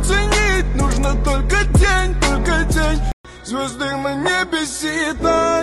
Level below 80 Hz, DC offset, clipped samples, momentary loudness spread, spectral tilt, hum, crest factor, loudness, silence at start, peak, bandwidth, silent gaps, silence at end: -20 dBFS; under 0.1%; under 0.1%; 8 LU; -4.5 dB/octave; none; 14 dB; -18 LUFS; 0 s; -4 dBFS; 13 kHz; 3.13-3.24 s; 0 s